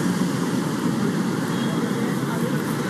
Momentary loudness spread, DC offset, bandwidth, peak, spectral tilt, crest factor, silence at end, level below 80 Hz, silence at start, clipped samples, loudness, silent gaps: 1 LU; under 0.1%; 15 kHz; -10 dBFS; -6 dB/octave; 14 dB; 0 s; -62 dBFS; 0 s; under 0.1%; -23 LUFS; none